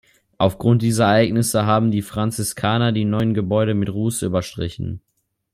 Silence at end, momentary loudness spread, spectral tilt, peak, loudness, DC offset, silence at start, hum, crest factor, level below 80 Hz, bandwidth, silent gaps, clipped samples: 0.55 s; 11 LU; -6 dB/octave; -2 dBFS; -19 LUFS; under 0.1%; 0.4 s; none; 18 dB; -50 dBFS; 15.5 kHz; none; under 0.1%